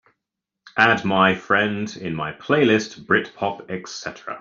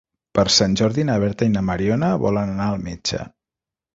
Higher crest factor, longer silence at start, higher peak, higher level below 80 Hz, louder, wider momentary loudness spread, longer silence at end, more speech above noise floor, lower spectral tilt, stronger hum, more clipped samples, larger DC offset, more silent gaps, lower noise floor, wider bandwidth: about the same, 20 dB vs 18 dB; first, 0.75 s vs 0.35 s; about the same, -2 dBFS vs -2 dBFS; second, -60 dBFS vs -44 dBFS; about the same, -20 LUFS vs -20 LUFS; first, 14 LU vs 10 LU; second, 0 s vs 0.65 s; second, 62 dB vs 69 dB; about the same, -5 dB/octave vs -5 dB/octave; neither; neither; neither; neither; second, -83 dBFS vs -88 dBFS; about the same, 7.4 kHz vs 7.8 kHz